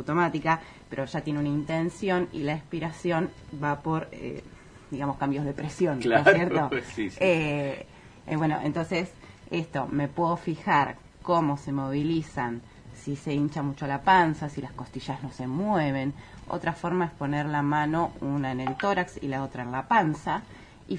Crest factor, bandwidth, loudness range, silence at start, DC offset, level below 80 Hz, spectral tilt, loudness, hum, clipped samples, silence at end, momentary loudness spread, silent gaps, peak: 26 dB; 10.5 kHz; 5 LU; 0 s; under 0.1%; -54 dBFS; -7 dB/octave; -28 LUFS; none; under 0.1%; 0 s; 12 LU; none; -2 dBFS